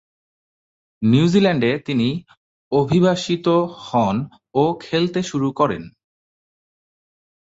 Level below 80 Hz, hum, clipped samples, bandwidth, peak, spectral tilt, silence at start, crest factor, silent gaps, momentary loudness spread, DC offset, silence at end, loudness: -56 dBFS; none; under 0.1%; 8 kHz; -2 dBFS; -6.5 dB/octave; 1 s; 18 dB; 2.37-2.71 s; 7 LU; under 0.1%; 1.7 s; -19 LUFS